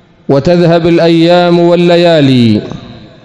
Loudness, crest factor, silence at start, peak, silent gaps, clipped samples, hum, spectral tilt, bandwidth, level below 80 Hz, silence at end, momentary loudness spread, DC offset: -7 LUFS; 8 dB; 0.3 s; 0 dBFS; none; 4%; none; -7.5 dB/octave; 11 kHz; -40 dBFS; 0.2 s; 7 LU; under 0.1%